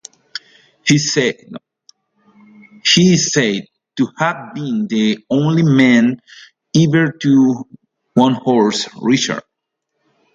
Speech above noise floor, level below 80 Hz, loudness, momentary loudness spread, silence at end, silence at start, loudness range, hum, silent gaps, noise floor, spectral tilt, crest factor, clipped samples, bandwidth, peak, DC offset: 61 dB; -58 dBFS; -15 LUFS; 19 LU; 0.95 s; 0.35 s; 3 LU; none; none; -75 dBFS; -4.5 dB/octave; 16 dB; under 0.1%; 7.8 kHz; 0 dBFS; under 0.1%